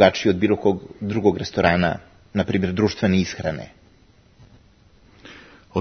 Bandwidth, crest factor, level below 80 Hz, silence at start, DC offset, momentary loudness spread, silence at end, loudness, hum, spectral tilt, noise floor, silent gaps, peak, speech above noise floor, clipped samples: 6.6 kHz; 22 dB; -52 dBFS; 0 s; under 0.1%; 15 LU; 0 s; -21 LUFS; none; -6.5 dB/octave; -54 dBFS; none; 0 dBFS; 34 dB; under 0.1%